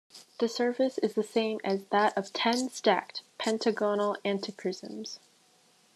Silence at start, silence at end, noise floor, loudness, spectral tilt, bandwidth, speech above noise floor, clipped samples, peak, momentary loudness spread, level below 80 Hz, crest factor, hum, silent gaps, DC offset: 0.15 s; 0.8 s; -64 dBFS; -30 LUFS; -4 dB/octave; 13 kHz; 35 dB; under 0.1%; -10 dBFS; 13 LU; -84 dBFS; 20 dB; none; none; under 0.1%